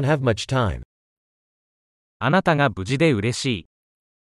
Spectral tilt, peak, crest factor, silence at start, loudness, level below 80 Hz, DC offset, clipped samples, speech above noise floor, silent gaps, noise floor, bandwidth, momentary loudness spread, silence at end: -6 dB/octave; -4 dBFS; 18 dB; 0 s; -21 LUFS; -46 dBFS; under 0.1%; under 0.1%; over 70 dB; 0.85-2.20 s; under -90 dBFS; 12 kHz; 8 LU; 0.75 s